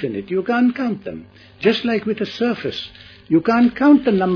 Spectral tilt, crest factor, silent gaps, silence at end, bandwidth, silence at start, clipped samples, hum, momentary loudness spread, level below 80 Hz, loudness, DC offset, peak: -7.5 dB/octave; 16 dB; none; 0 s; 5.4 kHz; 0 s; under 0.1%; none; 15 LU; -54 dBFS; -18 LUFS; under 0.1%; -2 dBFS